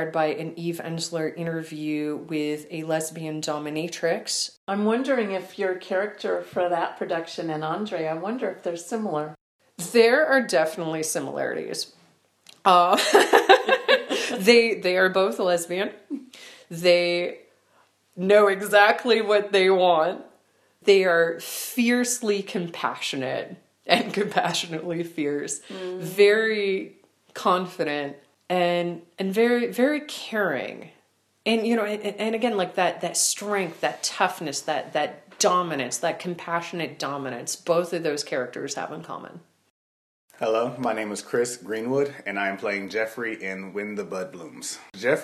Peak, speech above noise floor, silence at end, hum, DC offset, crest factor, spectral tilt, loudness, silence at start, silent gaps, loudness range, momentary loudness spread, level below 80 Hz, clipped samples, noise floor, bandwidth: 0 dBFS; 41 dB; 0 s; none; under 0.1%; 24 dB; -3.5 dB/octave; -24 LUFS; 0 s; 4.57-4.67 s, 9.41-9.59 s, 39.70-40.28 s; 8 LU; 13 LU; -78 dBFS; under 0.1%; -65 dBFS; 14.5 kHz